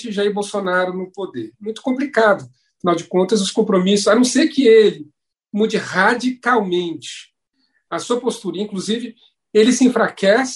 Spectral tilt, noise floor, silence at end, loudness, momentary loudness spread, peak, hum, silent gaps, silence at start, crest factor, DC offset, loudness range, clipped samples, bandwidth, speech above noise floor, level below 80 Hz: -4.5 dB/octave; -67 dBFS; 0 s; -17 LUFS; 15 LU; 0 dBFS; none; none; 0 s; 18 dB; under 0.1%; 6 LU; under 0.1%; 11.5 kHz; 50 dB; -66 dBFS